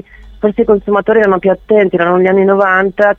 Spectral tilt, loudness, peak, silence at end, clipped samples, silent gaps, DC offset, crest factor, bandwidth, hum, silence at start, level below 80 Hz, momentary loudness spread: -8.5 dB/octave; -11 LUFS; 0 dBFS; 0.05 s; under 0.1%; none; under 0.1%; 10 dB; 4.2 kHz; none; 0.25 s; -40 dBFS; 4 LU